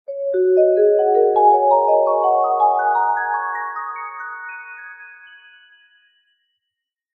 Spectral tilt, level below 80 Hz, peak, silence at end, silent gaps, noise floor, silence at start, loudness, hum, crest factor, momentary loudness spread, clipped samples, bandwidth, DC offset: -6.5 dB/octave; -76 dBFS; -4 dBFS; 2 s; none; -81 dBFS; 0.1 s; -16 LUFS; none; 16 dB; 18 LU; under 0.1%; 4 kHz; under 0.1%